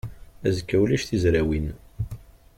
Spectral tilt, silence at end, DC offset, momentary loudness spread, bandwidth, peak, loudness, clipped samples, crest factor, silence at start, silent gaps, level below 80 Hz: -6.5 dB/octave; 0.4 s; under 0.1%; 13 LU; 15.5 kHz; -10 dBFS; -25 LUFS; under 0.1%; 16 dB; 0.05 s; none; -38 dBFS